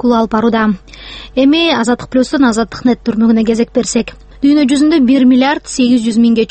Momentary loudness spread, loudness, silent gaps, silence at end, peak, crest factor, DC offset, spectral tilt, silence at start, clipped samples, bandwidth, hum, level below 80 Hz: 7 LU; -11 LUFS; none; 0.05 s; 0 dBFS; 10 dB; under 0.1%; -4.5 dB/octave; 0.05 s; under 0.1%; 8.8 kHz; none; -40 dBFS